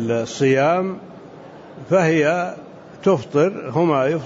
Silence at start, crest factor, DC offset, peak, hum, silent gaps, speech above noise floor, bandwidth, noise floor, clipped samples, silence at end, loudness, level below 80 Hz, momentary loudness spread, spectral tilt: 0 s; 14 dB; under 0.1%; -6 dBFS; none; none; 21 dB; 8 kHz; -40 dBFS; under 0.1%; 0 s; -19 LUFS; -62 dBFS; 22 LU; -6.5 dB/octave